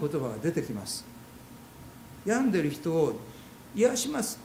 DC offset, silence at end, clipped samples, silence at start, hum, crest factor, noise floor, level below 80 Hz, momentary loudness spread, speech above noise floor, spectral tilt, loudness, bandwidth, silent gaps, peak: under 0.1%; 0 s; under 0.1%; 0 s; none; 18 dB; -49 dBFS; -62 dBFS; 22 LU; 20 dB; -5 dB/octave; -29 LUFS; 16.5 kHz; none; -12 dBFS